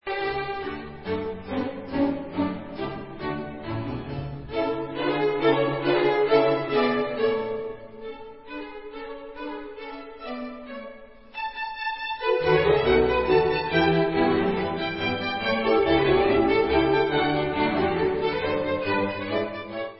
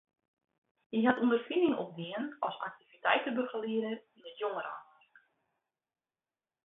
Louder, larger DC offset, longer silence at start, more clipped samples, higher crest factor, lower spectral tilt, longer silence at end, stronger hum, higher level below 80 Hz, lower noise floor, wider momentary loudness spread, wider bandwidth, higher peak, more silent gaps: first, -24 LUFS vs -33 LUFS; first, 0.3% vs under 0.1%; second, 0.05 s vs 0.9 s; neither; about the same, 18 dB vs 22 dB; first, -10.5 dB/octave vs -8.5 dB/octave; second, 0 s vs 1.85 s; neither; first, -46 dBFS vs -82 dBFS; second, -45 dBFS vs under -90 dBFS; first, 17 LU vs 14 LU; first, 5.8 kHz vs 4 kHz; first, -6 dBFS vs -14 dBFS; neither